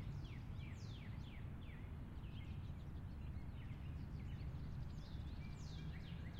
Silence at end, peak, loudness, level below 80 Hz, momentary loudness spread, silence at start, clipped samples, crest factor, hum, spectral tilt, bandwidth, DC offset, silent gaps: 0 s; -38 dBFS; -52 LUFS; -54 dBFS; 3 LU; 0 s; under 0.1%; 10 dB; none; -7 dB/octave; 15.5 kHz; under 0.1%; none